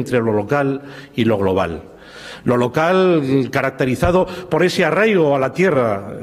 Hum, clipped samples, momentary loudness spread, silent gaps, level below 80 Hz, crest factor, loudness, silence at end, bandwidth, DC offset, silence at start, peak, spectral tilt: none; under 0.1%; 10 LU; none; -42 dBFS; 14 dB; -17 LUFS; 0 s; 14.5 kHz; under 0.1%; 0 s; -2 dBFS; -6.5 dB/octave